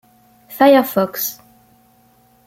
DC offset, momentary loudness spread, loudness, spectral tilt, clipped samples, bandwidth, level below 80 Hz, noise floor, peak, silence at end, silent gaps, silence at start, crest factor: under 0.1%; 12 LU; -15 LUFS; -4.5 dB/octave; under 0.1%; 16.5 kHz; -62 dBFS; -54 dBFS; -2 dBFS; 1.15 s; none; 0.5 s; 18 dB